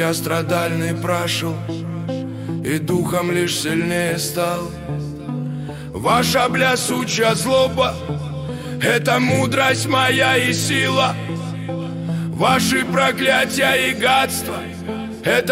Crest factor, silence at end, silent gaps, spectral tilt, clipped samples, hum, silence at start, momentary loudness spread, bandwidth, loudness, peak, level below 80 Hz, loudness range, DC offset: 16 dB; 0 s; none; -4 dB/octave; under 0.1%; none; 0 s; 11 LU; 16 kHz; -19 LUFS; -2 dBFS; -46 dBFS; 4 LU; under 0.1%